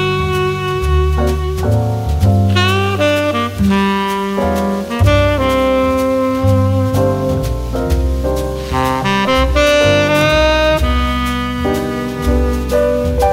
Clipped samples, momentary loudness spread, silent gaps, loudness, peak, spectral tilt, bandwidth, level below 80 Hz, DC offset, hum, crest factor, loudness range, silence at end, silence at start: under 0.1%; 6 LU; none; -14 LUFS; 0 dBFS; -6 dB/octave; 16 kHz; -22 dBFS; under 0.1%; none; 14 dB; 2 LU; 0 s; 0 s